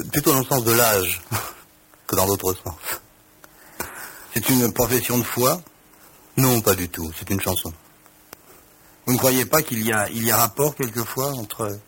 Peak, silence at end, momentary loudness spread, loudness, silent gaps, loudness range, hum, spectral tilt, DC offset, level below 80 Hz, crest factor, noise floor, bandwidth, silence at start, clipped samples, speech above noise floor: -4 dBFS; 0.05 s; 14 LU; -21 LUFS; none; 3 LU; none; -4 dB/octave; under 0.1%; -50 dBFS; 20 dB; -51 dBFS; 17 kHz; 0 s; under 0.1%; 30 dB